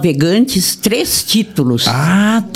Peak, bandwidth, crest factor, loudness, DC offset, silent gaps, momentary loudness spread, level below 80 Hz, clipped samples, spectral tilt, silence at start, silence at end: 0 dBFS; 16.5 kHz; 12 dB; -12 LUFS; under 0.1%; none; 2 LU; -44 dBFS; under 0.1%; -4 dB/octave; 0 s; 0 s